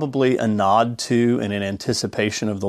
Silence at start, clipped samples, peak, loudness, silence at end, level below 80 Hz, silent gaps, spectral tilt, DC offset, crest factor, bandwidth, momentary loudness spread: 0 s; under 0.1%; -4 dBFS; -20 LUFS; 0 s; -58 dBFS; none; -5 dB/octave; under 0.1%; 16 dB; 14 kHz; 6 LU